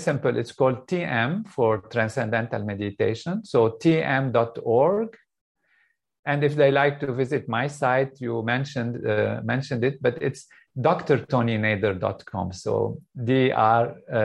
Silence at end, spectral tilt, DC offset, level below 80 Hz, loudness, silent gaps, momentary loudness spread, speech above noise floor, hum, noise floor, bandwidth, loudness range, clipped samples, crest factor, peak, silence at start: 0 s; -7 dB/octave; under 0.1%; -64 dBFS; -24 LUFS; 5.41-5.55 s, 6.19-6.23 s; 9 LU; 44 dB; none; -67 dBFS; 11.5 kHz; 2 LU; under 0.1%; 18 dB; -6 dBFS; 0 s